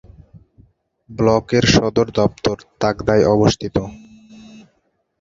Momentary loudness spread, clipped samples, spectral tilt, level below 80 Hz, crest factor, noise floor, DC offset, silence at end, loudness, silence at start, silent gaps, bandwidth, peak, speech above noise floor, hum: 10 LU; under 0.1%; -5.5 dB/octave; -40 dBFS; 18 dB; -66 dBFS; under 0.1%; 1.25 s; -17 LUFS; 1.1 s; none; 7.8 kHz; 0 dBFS; 50 dB; none